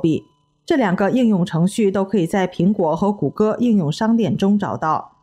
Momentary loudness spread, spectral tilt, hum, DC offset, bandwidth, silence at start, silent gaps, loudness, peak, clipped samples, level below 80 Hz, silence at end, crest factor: 4 LU; -7 dB/octave; none; under 0.1%; 12.5 kHz; 0 s; none; -18 LUFS; -6 dBFS; under 0.1%; -54 dBFS; 0.2 s; 12 dB